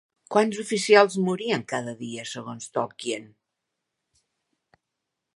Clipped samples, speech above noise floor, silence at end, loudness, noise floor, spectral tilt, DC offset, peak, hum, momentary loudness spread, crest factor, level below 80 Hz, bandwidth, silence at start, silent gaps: under 0.1%; 59 dB; 2.1 s; -25 LUFS; -83 dBFS; -4 dB/octave; under 0.1%; -2 dBFS; none; 17 LU; 26 dB; -76 dBFS; 11.5 kHz; 0.3 s; none